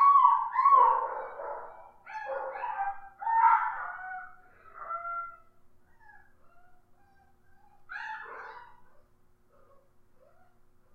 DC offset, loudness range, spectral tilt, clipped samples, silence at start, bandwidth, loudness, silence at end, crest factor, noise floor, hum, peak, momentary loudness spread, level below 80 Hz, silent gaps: under 0.1%; 19 LU; -4 dB/octave; under 0.1%; 0 s; 4.7 kHz; -28 LUFS; 2.1 s; 22 dB; -62 dBFS; none; -8 dBFS; 23 LU; -66 dBFS; none